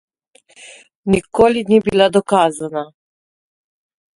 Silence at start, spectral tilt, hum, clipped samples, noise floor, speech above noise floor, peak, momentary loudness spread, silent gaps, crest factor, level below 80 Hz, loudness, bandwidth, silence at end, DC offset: 0.65 s; -5.5 dB/octave; none; under 0.1%; -53 dBFS; 38 dB; 0 dBFS; 14 LU; 0.95-1.03 s; 18 dB; -46 dBFS; -15 LUFS; 11.5 kHz; 1.3 s; under 0.1%